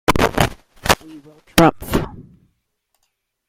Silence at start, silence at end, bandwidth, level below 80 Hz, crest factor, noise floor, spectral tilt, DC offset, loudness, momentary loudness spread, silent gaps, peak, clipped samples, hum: 0.1 s; 1.25 s; 16.5 kHz; -34 dBFS; 20 dB; -71 dBFS; -4.5 dB/octave; under 0.1%; -18 LUFS; 9 LU; none; 0 dBFS; under 0.1%; none